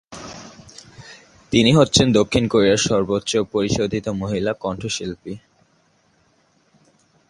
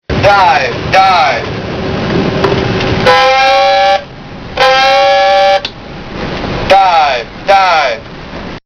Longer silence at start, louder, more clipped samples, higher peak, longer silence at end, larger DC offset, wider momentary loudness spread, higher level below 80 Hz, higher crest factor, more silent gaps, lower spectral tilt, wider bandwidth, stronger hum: about the same, 0.1 s vs 0.1 s; second, -19 LUFS vs -9 LUFS; second, under 0.1% vs 0.6%; about the same, 0 dBFS vs 0 dBFS; first, 1.9 s vs 0.05 s; neither; first, 23 LU vs 15 LU; second, -46 dBFS vs -32 dBFS; first, 20 dB vs 10 dB; neither; about the same, -4.5 dB/octave vs -4.5 dB/octave; first, 11.5 kHz vs 5.4 kHz; neither